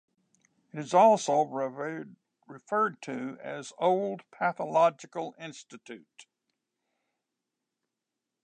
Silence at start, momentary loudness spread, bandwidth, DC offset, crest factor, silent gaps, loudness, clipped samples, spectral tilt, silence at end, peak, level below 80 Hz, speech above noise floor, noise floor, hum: 0.75 s; 24 LU; 9.6 kHz; under 0.1%; 22 dB; none; -28 LUFS; under 0.1%; -5 dB/octave; 2.2 s; -10 dBFS; -88 dBFS; 58 dB; -87 dBFS; none